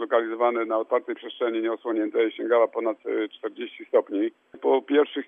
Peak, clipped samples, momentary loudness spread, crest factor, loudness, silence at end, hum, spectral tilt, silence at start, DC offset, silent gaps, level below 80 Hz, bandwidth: -8 dBFS; under 0.1%; 9 LU; 18 dB; -25 LUFS; 0.05 s; none; -6.5 dB/octave; 0 s; under 0.1%; none; -88 dBFS; 3.7 kHz